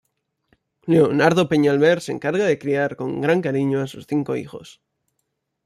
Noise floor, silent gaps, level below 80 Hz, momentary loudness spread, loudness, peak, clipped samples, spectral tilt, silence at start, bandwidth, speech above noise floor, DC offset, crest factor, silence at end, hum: -75 dBFS; none; -62 dBFS; 11 LU; -20 LUFS; -4 dBFS; under 0.1%; -6.5 dB/octave; 0.85 s; 13.5 kHz; 56 dB; under 0.1%; 18 dB; 0.95 s; none